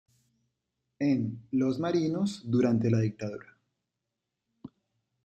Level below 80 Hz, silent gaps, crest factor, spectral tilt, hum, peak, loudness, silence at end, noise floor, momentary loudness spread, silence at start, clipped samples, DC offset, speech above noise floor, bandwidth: -70 dBFS; none; 18 dB; -8 dB/octave; none; -14 dBFS; -29 LUFS; 0.6 s; -86 dBFS; 9 LU; 1 s; under 0.1%; under 0.1%; 58 dB; 9.2 kHz